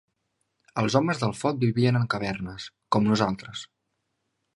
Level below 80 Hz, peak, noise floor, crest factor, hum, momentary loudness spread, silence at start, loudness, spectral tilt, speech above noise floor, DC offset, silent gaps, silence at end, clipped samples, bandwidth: -58 dBFS; -6 dBFS; -78 dBFS; 22 dB; none; 14 LU; 0.75 s; -25 LUFS; -6.5 dB/octave; 53 dB; under 0.1%; none; 0.9 s; under 0.1%; 11.5 kHz